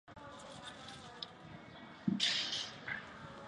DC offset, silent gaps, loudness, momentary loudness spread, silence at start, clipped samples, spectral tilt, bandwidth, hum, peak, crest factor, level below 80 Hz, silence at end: under 0.1%; none; -39 LUFS; 20 LU; 0.05 s; under 0.1%; -3 dB/octave; 11 kHz; none; -20 dBFS; 22 dB; -72 dBFS; 0 s